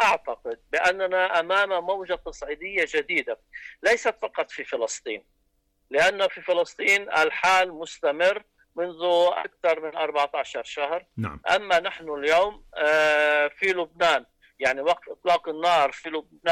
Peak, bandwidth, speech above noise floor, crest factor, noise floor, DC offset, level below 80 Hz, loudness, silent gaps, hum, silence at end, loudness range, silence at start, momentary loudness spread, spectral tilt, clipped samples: -12 dBFS; 15 kHz; 45 dB; 12 dB; -70 dBFS; under 0.1%; -58 dBFS; -24 LUFS; none; none; 0 s; 4 LU; 0 s; 12 LU; -2.5 dB/octave; under 0.1%